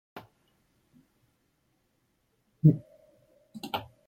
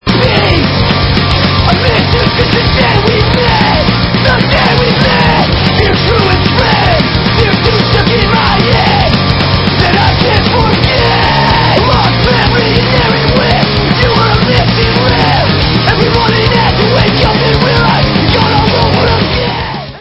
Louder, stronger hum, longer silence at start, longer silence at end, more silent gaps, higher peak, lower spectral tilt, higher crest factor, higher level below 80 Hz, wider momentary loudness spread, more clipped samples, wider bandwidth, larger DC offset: second, -27 LUFS vs -8 LUFS; neither; about the same, 0.15 s vs 0.05 s; first, 0.25 s vs 0 s; neither; second, -8 dBFS vs 0 dBFS; first, -8.5 dB/octave vs -7 dB/octave; first, 24 dB vs 8 dB; second, -68 dBFS vs -20 dBFS; first, 26 LU vs 1 LU; second, under 0.1% vs 0.7%; first, 14 kHz vs 8 kHz; neither